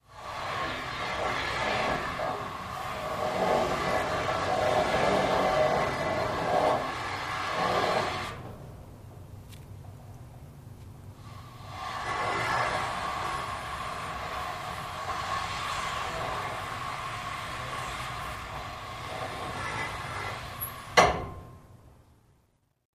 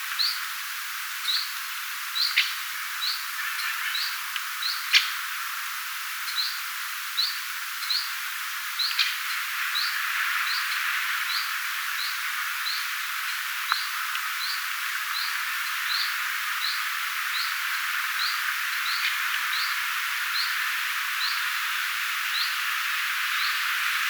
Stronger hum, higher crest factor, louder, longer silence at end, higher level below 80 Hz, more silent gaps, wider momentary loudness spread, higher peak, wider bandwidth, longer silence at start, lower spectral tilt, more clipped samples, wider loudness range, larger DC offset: neither; about the same, 26 dB vs 24 dB; second, -30 LUFS vs -26 LUFS; first, 1 s vs 0 s; first, -50 dBFS vs under -90 dBFS; neither; first, 21 LU vs 6 LU; about the same, -6 dBFS vs -4 dBFS; second, 15.5 kHz vs over 20 kHz; about the same, 0.1 s vs 0 s; first, -4 dB/octave vs 12.5 dB/octave; neither; first, 9 LU vs 2 LU; neither